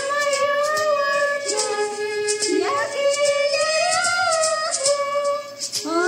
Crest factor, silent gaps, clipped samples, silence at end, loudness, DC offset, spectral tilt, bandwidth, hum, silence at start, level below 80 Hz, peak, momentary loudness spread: 14 dB; none; under 0.1%; 0 s; -20 LUFS; under 0.1%; -0.5 dB/octave; 16 kHz; none; 0 s; -76 dBFS; -6 dBFS; 6 LU